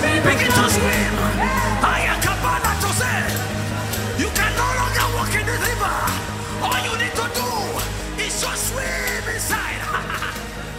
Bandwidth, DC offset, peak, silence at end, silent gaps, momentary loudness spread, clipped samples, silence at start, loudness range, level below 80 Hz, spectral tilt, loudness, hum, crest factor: 16.5 kHz; under 0.1%; -4 dBFS; 0 s; none; 8 LU; under 0.1%; 0 s; 4 LU; -32 dBFS; -3.5 dB/octave; -20 LUFS; none; 18 dB